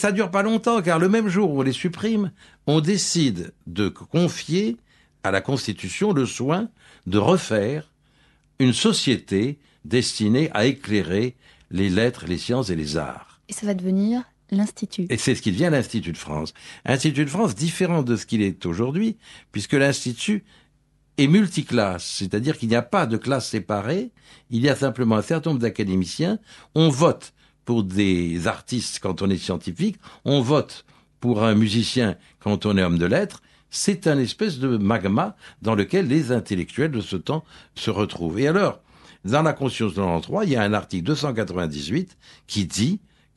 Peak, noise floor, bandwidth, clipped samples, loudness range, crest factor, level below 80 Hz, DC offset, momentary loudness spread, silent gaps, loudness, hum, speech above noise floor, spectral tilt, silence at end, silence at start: -4 dBFS; -62 dBFS; 12 kHz; under 0.1%; 2 LU; 20 dB; -52 dBFS; under 0.1%; 10 LU; none; -23 LUFS; none; 40 dB; -5.5 dB/octave; 0.4 s; 0 s